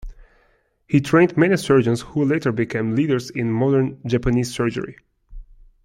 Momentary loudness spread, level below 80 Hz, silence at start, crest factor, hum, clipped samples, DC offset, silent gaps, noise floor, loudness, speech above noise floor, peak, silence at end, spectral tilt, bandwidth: 8 LU; -42 dBFS; 0.05 s; 18 dB; none; under 0.1%; under 0.1%; none; -62 dBFS; -20 LUFS; 43 dB; -2 dBFS; 0.4 s; -7 dB/octave; 15.5 kHz